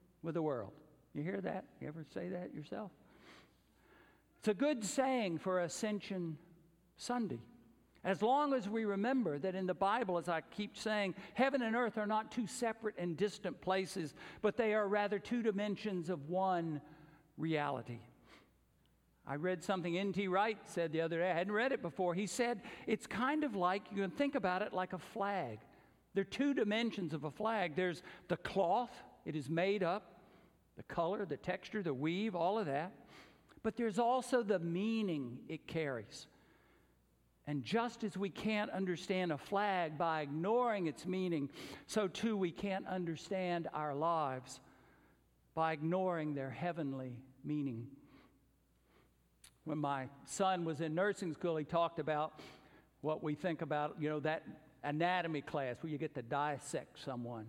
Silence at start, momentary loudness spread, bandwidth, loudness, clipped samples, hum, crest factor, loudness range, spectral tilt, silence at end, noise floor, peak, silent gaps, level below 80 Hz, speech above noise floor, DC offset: 0.25 s; 11 LU; 16 kHz; -38 LUFS; under 0.1%; none; 20 dB; 5 LU; -5.5 dB/octave; 0 s; -73 dBFS; -20 dBFS; none; -74 dBFS; 35 dB; under 0.1%